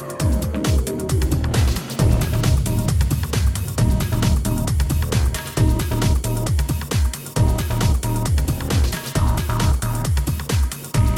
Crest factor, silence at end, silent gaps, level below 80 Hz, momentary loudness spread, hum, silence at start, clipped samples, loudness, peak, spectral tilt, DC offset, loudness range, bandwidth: 14 dB; 0 s; none; -22 dBFS; 3 LU; none; 0 s; under 0.1%; -21 LUFS; -4 dBFS; -5.5 dB/octave; under 0.1%; 1 LU; 17.5 kHz